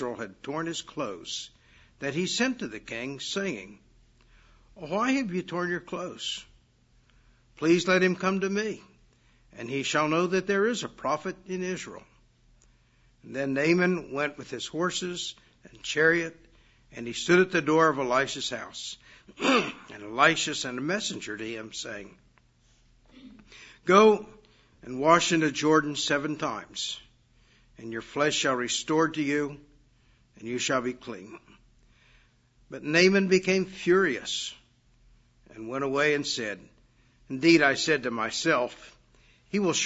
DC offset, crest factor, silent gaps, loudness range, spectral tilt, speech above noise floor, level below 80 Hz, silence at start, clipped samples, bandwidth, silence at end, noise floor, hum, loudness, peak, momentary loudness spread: under 0.1%; 24 dB; none; 7 LU; -4 dB/octave; 36 dB; -64 dBFS; 0 s; under 0.1%; 8 kHz; 0 s; -63 dBFS; none; -27 LUFS; -6 dBFS; 17 LU